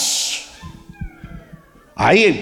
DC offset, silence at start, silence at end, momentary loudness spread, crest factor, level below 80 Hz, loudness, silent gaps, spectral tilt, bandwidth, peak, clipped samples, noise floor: under 0.1%; 0 s; 0 s; 26 LU; 18 dB; -42 dBFS; -16 LUFS; none; -3 dB/octave; 17 kHz; -2 dBFS; under 0.1%; -44 dBFS